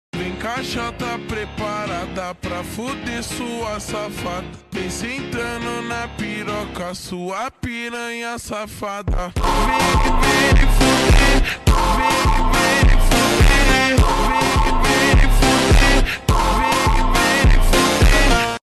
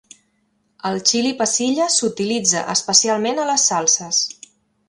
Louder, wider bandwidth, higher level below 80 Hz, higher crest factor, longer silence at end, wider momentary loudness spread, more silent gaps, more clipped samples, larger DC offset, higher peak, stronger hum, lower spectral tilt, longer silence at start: about the same, -18 LUFS vs -17 LUFS; first, 13 kHz vs 11.5 kHz; first, -20 dBFS vs -66 dBFS; second, 10 dB vs 20 dB; second, 0.15 s vs 0.55 s; first, 13 LU vs 6 LU; neither; neither; neither; second, -6 dBFS vs 0 dBFS; neither; first, -4 dB/octave vs -1.5 dB/octave; second, 0.15 s vs 0.85 s